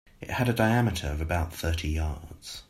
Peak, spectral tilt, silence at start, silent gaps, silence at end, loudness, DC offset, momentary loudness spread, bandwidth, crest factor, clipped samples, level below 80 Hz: -8 dBFS; -6 dB/octave; 0.2 s; none; 0.05 s; -28 LUFS; under 0.1%; 11 LU; 15 kHz; 20 dB; under 0.1%; -38 dBFS